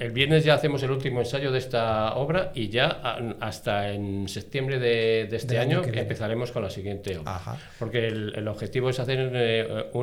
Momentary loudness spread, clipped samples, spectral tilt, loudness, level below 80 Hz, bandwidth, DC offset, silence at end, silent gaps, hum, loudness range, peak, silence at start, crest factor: 10 LU; under 0.1%; -6 dB/octave; -26 LUFS; -50 dBFS; 16 kHz; under 0.1%; 0 s; none; none; 4 LU; -6 dBFS; 0 s; 20 dB